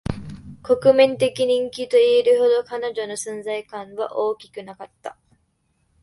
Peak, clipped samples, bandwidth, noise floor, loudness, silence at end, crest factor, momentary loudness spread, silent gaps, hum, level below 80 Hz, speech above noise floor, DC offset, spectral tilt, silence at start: -2 dBFS; under 0.1%; 11.5 kHz; -67 dBFS; -20 LUFS; 0.9 s; 20 dB; 22 LU; none; none; -50 dBFS; 47 dB; under 0.1%; -4.5 dB/octave; 0.1 s